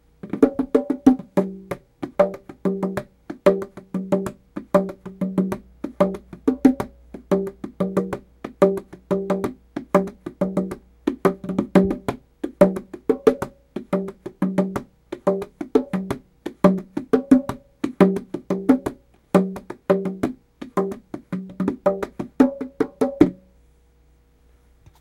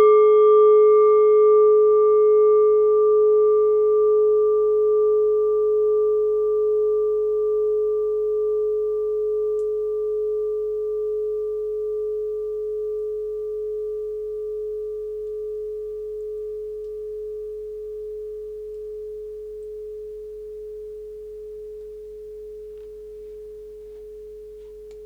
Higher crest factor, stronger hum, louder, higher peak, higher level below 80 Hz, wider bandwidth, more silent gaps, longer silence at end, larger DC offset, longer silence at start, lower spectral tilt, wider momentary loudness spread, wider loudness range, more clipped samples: first, 22 dB vs 14 dB; neither; second, -23 LUFS vs -20 LUFS; first, 0 dBFS vs -8 dBFS; about the same, -50 dBFS vs -54 dBFS; first, 15.5 kHz vs 3.4 kHz; neither; first, 1.65 s vs 0 s; neither; first, 0.25 s vs 0 s; about the same, -8 dB/octave vs -7 dB/octave; second, 14 LU vs 23 LU; second, 3 LU vs 20 LU; neither